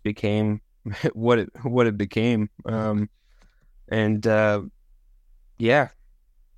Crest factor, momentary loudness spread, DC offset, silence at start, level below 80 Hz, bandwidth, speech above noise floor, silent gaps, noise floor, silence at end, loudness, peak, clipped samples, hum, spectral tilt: 18 dB; 9 LU; under 0.1%; 0.05 s; -54 dBFS; 9 kHz; 34 dB; none; -57 dBFS; 0.7 s; -24 LUFS; -6 dBFS; under 0.1%; none; -7.5 dB/octave